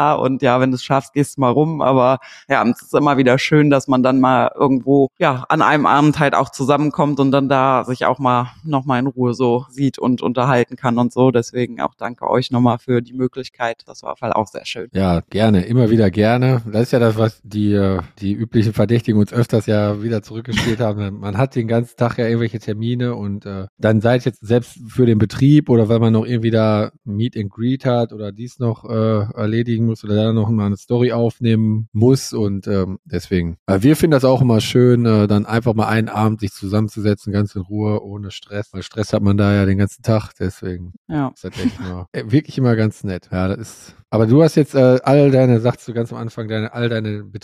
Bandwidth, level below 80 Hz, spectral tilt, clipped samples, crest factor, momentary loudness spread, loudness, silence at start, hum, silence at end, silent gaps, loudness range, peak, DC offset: 14.5 kHz; -48 dBFS; -7.5 dB/octave; under 0.1%; 14 dB; 11 LU; -17 LUFS; 0 s; none; 0.05 s; 23.69-23.77 s, 31.88-31.92 s, 32.99-33.03 s, 33.59-33.66 s, 40.97-41.05 s, 42.08-42.12 s; 5 LU; -2 dBFS; under 0.1%